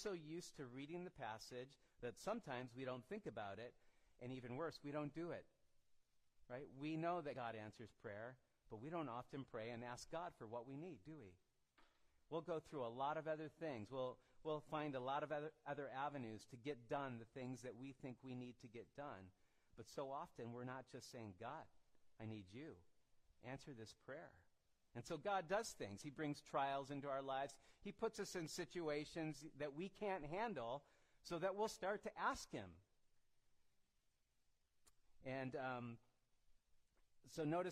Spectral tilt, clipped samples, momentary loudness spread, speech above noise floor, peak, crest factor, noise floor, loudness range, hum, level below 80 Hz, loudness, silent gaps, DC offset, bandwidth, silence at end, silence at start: -5.5 dB/octave; under 0.1%; 13 LU; 33 dB; -30 dBFS; 20 dB; -83 dBFS; 7 LU; none; -78 dBFS; -50 LUFS; none; under 0.1%; 14.5 kHz; 0 s; 0 s